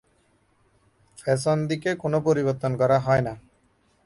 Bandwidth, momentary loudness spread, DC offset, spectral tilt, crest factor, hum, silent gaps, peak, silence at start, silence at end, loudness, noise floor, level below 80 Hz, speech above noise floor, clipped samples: 11.5 kHz; 9 LU; under 0.1%; -6.5 dB/octave; 16 dB; none; none; -8 dBFS; 1.2 s; 0.65 s; -24 LUFS; -64 dBFS; -56 dBFS; 42 dB; under 0.1%